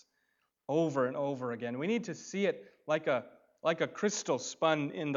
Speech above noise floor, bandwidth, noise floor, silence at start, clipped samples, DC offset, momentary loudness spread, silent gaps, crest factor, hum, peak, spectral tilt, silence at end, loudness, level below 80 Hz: 46 dB; 7.8 kHz; -79 dBFS; 0.7 s; under 0.1%; under 0.1%; 6 LU; none; 20 dB; none; -14 dBFS; -4.5 dB/octave; 0 s; -33 LUFS; -86 dBFS